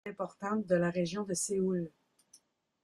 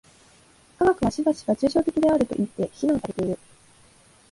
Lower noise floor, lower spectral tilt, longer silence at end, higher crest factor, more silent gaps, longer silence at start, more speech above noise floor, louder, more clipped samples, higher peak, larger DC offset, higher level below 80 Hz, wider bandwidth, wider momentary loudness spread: first, -66 dBFS vs -55 dBFS; second, -5 dB/octave vs -6.5 dB/octave; about the same, 0.95 s vs 0.95 s; about the same, 20 dB vs 16 dB; neither; second, 0.05 s vs 0.8 s; about the same, 33 dB vs 33 dB; second, -33 LUFS vs -24 LUFS; neither; second, -16 dBFS vs -8 dBFS; neither; second, -70 dBFS vs -52 dBFS; first, 13.5 kHz vs 11.5 kHz; about the same, 9 LU vs 7 LU